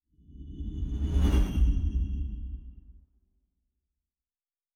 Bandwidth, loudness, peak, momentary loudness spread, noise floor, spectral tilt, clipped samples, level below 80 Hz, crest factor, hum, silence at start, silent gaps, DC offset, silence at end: 10 kHz; -30 LUFS; -14 dBFS; 20 LU; under -90 dBFS; -7.5 dB/octave; under 0.1%; -30 dBFS; 16 dB; none; 0.3 s; none; under 0.1%; 1.85 s